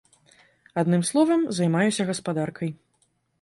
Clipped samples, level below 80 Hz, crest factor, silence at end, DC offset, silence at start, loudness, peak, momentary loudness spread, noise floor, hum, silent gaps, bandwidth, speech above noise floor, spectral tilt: under 0.1%; -68 dBFS; 16 dB; 0.65 s; under 0.1%; 0.75 s; -24 LUFS; -8 dBFS; 11 LU; -69 dBFS; none; none; 11.5 kHz; 46 dB; -5.5 dB/octave